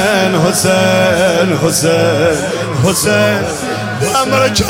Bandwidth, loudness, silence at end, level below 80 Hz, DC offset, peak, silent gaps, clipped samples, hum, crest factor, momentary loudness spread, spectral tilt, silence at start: 17 kHz; -12 LUFS; 0 s; -38 dBFS; under 0.1%; 0 dBFS; none; under 0.1%; none; 12 dB; 6 LU; -4 dB/octave; 0 s